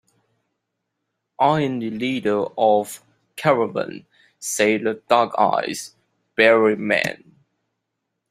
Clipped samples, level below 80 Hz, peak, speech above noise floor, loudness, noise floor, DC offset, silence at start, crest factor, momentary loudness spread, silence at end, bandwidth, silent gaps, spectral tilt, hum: under 0.1%; -66 dBFS; -2 dBFS; 59 dB; -20 LUFS; -78 dBFS; under 0.1%; 1.4 s; 20 dB; 15 LU; 1.15 s; 16 kHz; none; -4.5 dB/octave; none